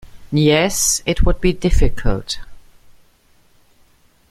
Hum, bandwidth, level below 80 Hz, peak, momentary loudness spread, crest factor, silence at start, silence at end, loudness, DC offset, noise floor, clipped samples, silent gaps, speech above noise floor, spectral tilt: none; 16 kHz; -22 dBFS; -2 dBFS; 10 LU; 16 dB; 0.05 s; 1.7 s; -18 LUFS; under 0.1%; -53 dBFS; under 0.1%; none; 39 dB; -4 dB/octave